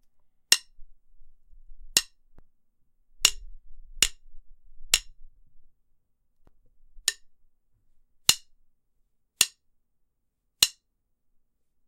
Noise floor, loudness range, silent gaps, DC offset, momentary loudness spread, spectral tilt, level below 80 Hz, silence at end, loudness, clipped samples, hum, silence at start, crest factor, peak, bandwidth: -76 dBFS; 5 LU; none; under 0.1%; 6 LU; 2 dB/octave; -50 dBFS; 1.15 s; -25 LUFS; under 0.1%; none; 0.5 s; 32 dB; 0 dBFS; 16 kHz